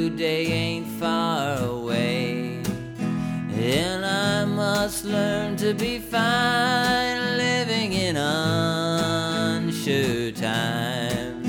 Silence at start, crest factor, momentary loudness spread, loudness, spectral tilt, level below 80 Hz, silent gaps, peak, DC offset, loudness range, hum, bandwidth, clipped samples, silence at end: 0 s; 16 dB; 7 LU; -24 LUFS; -4.5 dB/octave; -50 dBFS; none; -8 dBFS; under 0.1%; 3 LU; none; over 20 kHz; under 0.1%; 0 s